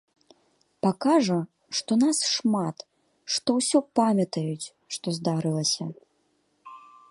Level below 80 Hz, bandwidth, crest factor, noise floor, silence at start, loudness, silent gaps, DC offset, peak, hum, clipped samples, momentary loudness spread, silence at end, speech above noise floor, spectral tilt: -72 dBFS; 11.5 kHz; 20 dB; -70 dBFS; 0.85 s; -25 LUFS; none; under 0.1%; -8 dBFS; none; under 0.1%; 11 LU; 0.3 s; 45 dB; -4.5 dB/octave